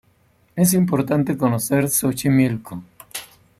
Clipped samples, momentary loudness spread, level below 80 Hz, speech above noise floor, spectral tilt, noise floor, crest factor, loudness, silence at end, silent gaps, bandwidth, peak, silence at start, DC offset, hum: under 0.1%; 16 LU; -54 dBFS; 40 dB; -5.5 dB/octave; -59 dBFS; 16 dB; -19 LUFS; 0.35 s; none; 15.5 kHz; -4 dBFS; 0.55 s; under 0.1%; none